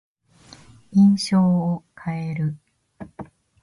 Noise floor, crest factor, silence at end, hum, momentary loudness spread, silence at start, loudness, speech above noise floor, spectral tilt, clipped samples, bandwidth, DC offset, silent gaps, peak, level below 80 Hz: -50 dBFS; 16 dB; 0.4 s; none; 25 LU; 0.9 s; -21 LUFS; 31 dB; -7 dB/octave; under 0.1%; 11.5 kHz; under 0.1%; none; -8 dBFS; -58 dBFS